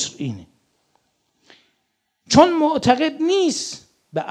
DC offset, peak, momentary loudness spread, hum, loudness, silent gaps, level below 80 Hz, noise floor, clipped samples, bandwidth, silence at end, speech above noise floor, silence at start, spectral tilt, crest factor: under 0.1%; 0 dBFS; 16 LU; none; -18 LUFS; none; -54 dBFS; -72 dBFS; under 0.1%; 11.5 kHz; 0 s; 55 dB; 0 s; -4.5 dB/octave; 20 dB